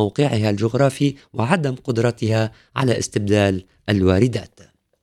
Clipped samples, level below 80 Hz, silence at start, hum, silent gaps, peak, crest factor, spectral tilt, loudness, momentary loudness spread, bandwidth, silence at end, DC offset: under 0.1%; -50 dBFS; 0 s; none; none; -2 dBFS; 18 dB; -6.5 dB/octave; -20 LUFS; 5 LU; 13 kHz; 0.55 s; under 0.1%